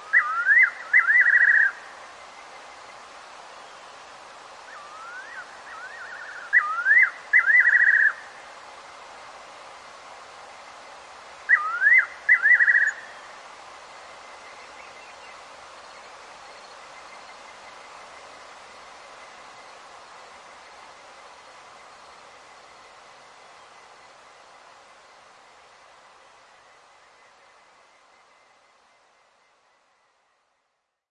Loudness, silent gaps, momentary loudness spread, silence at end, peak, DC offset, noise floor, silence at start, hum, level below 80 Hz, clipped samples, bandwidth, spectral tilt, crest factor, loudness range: -17 LUFS; none; 28 LU; 13.4 s; -8 dBFS; under 0.1%; -76 dBFS; 0 s; none; -76 dBFS; under 0.1%; 11 kHz; 0 dB/octave; 20 dB; 25 LU